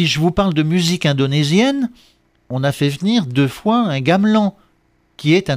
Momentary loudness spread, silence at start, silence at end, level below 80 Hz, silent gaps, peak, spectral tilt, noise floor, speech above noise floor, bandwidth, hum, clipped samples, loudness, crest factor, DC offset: 7 LU; 0 s; 0 s; -44 dBFS; none; -2 dBFS; -6 dB/octave; -59 dBFS; 43 dB; 15.5 kHz; 60 Hz at -45 dBFS; under 0.1%; -16 LUFS; 14 dB; under 0.1%